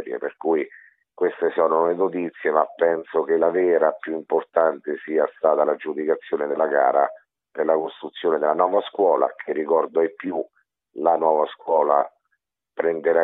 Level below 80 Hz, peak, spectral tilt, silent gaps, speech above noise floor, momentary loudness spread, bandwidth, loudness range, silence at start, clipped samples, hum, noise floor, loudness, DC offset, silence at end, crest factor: -76 dBFS; -2 dBFS; -9 dB/octave; none; 54 dB; 10 LU; 4 kHz; 2 LU; 0 s; under 0.1%; none; -75 dBFS; -22 LUFS; under 0.1%; 0 s; 18 dB